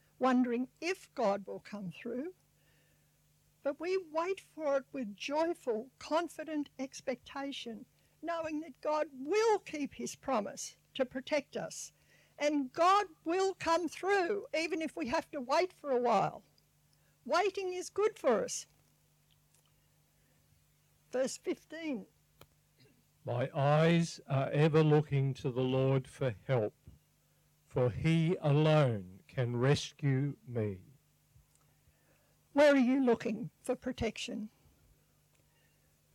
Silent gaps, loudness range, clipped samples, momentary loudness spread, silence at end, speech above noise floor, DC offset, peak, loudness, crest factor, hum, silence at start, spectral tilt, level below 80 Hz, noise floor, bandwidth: none; 8 LU; under 0.1%; 14 LU; 1.65 s; 38 dB; under 0.1%; -18 dBFS; -34 LUFS; 16 dB; 50 Hz at -60 dBFS; 0.2 s; -6 dB/octave; -68 dBFS; -71 dBFS; 14.5 kHz